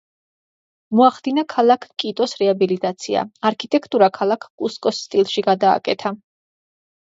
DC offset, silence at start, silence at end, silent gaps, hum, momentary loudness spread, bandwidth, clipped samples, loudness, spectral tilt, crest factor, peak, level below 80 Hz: under 0.1%; 0.9 s; 0.85 s; 4.50-4.58 s; none; 8 LU; 7.8 kHz; under 0.1%; -19 LUFS; -5 dB/octave; 18 dB; 0 dBFS; -68 dBFS